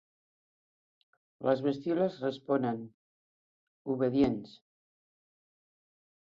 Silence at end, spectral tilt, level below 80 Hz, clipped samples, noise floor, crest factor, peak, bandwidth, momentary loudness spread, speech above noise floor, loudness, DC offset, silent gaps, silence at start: 1.85 s; -8.5 dB/octave; -68 dBFS; under 0.1%; under -90 dBFS; 20 dB; -14 dBFS; 7.2 kHz; 12 LU; over 59 dB; -32 LUFS; under 0.1%; 2.94-3.85 s; 1.4 s